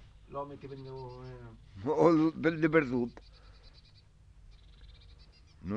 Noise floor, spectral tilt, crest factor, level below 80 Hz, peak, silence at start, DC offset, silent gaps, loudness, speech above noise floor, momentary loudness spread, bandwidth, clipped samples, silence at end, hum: -59 dBFS; -8 dB/octave; 22 dB; -58 dBFS; -12 dBFS; 0 s; under 0.1%; none; -30 LUFS; 28 dB; 22 LU; 7.2 kHz; under 0.1%; 0 s; none